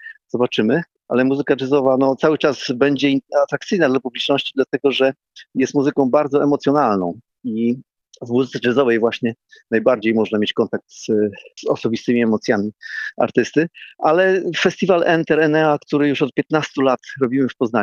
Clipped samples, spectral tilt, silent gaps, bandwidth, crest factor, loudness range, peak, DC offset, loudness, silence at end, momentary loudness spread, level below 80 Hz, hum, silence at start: under 0.1%; -6 dB/octave; none; 7.2 kHz; 16 dB; 3 LU; -2 dBFS; under 0.1%; -18 LUFS; 0 s; 8 LU; -62 dBFS; none; 0 s